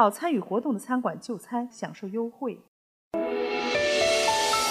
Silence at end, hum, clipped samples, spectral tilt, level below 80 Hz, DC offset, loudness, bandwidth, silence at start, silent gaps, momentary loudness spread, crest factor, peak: 0 s; none; under 0.1%; -3 dB/octave; -62 dBFS; under 0.1%; -27 LUFS; 15.5 kHz; 0 s; 2.68-3.11 s; 13 LU; 20 dB; -6 dBFS